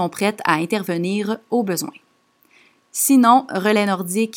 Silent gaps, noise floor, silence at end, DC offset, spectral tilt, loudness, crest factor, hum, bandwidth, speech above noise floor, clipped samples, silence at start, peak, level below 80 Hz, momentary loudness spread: none; -60 dBFS; 0 s; under 0.1%; -4 dB/octave; -18 LUFS; 18 dB; none; 18.5 kHz; 41 dB; under 0.1%; 0 s; -2 dBFS; -76 dBFS; 10 LU